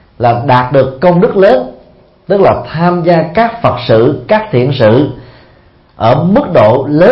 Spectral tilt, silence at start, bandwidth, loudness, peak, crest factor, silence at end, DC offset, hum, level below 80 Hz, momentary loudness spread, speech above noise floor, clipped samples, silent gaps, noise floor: -9.5 dB/octave; 0.2 s; 5.8 kHz; -9 LUFS; 0 dBFS; 10 dB; 0 s; under 0.1%; none; -38 dBFS; 5 LU; 35 dB; 0.4%; none; -43 dBFS